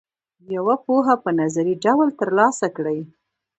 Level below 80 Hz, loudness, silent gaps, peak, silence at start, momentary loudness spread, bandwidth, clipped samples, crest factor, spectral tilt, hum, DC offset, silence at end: -68 dBFS; -20 LUFS; none; -2 dBFS; 0.5 s; 9 LU; 8.8 kHz; under 0.1%; 18 dB; -6 dB/octave; none; under 0.1%; 0.55 s